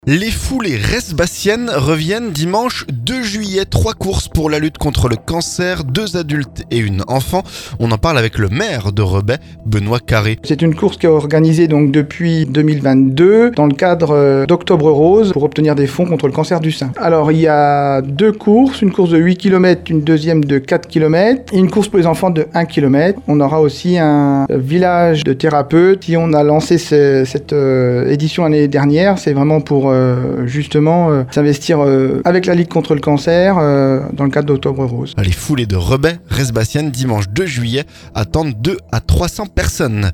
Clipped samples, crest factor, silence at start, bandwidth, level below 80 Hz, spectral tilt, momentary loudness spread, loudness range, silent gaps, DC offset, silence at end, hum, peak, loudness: under 0.1%; 12 dB; 0.05 s; 19 kHz; -32 dBFS; -6.5 dB/octave; 7 LU; 5 LU; none; under 0.1%; 0 s; none; 0 dBFS; -13 LUFS